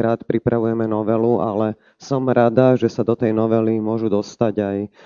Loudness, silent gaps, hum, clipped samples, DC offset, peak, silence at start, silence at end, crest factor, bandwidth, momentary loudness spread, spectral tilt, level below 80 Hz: -19 LUFS; none; none; under 0.1%; under 0.1%; -2 dBFS; 0 s; 0.2 s; 18 dB; 7.2 kHz; 7 LU; -8.5 dB/octave; -56 dBFS